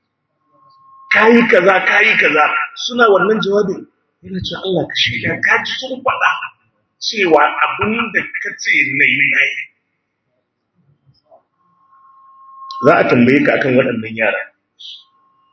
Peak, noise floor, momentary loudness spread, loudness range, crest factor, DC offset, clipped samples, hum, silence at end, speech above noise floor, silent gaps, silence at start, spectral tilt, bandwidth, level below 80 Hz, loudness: 0 dBFS; -69 dBFS; 14 LU; 6 LU; 16 dB; under 0.1%; under 0.1%; none; 0.55 s; 56 dB; none; 1.1 s; -4.5 dB/octave; 8 kHz; -54 dBFS; -13 LUFS